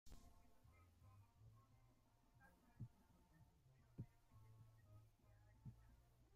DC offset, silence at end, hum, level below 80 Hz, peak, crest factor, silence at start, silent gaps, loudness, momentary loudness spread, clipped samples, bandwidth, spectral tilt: under 0.1%; 0 s; none; -74 dBFS; -44 dBFS; 22 dB; 0.05 s; none; -64 LUFS; 8 LU; under 0.1%; 15 kHz; -6.5 dB/octave